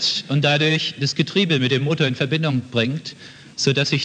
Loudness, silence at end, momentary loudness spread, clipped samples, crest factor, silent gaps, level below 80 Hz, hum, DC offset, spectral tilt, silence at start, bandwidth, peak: -20 LUFS; 0 s; 9 LU; under 0.1%; 16 dB; none; -64 dBFS; none; under 0.1%; -5 dB/octave; 0 s; 9.4 kHz; -4 dBFS